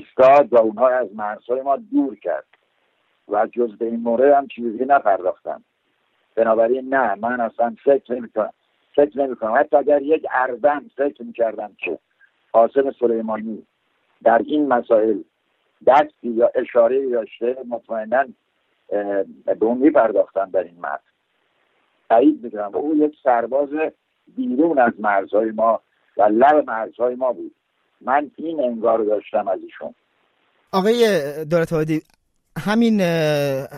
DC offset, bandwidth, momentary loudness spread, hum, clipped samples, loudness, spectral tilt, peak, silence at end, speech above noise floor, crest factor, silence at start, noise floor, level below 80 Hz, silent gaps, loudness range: under 0.1%; 14.5 kHz; 12 LU; none; under 0.1%; -19 LUFS; -6.5 dB/octave; -4 dBFS; 0 s; 49 dB; 16 dB; 0 s; -67 dBFS; -64 dBFS; none; 4 LU